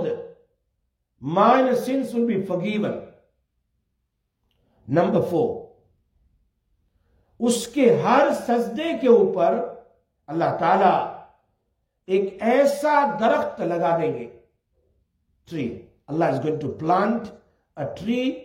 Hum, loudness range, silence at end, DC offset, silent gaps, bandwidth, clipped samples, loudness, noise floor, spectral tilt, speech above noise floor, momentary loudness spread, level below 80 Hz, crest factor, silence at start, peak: none; 7 LU; 0 s; under 0.1%; none; 16.5 kHz; under 0.1%; -22 LUFS; -75 dBFS; -6 dB/octave; 55 dB; 16 LU; -64 dBFS; 20 dB; 0 s; -4 dBFS